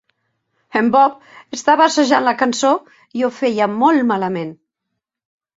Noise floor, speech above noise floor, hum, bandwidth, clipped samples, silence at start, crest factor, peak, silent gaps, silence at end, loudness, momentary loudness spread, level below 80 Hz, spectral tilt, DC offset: -78 dBFS; 62 dB; none; 8 kHz; under 0.1%; 0.75 s; 16 dB; -2 dBFS; none; 1.05 s; -16 LUFS; 10 LU; -64 dBFS; -4 dB/octave; under 0.1%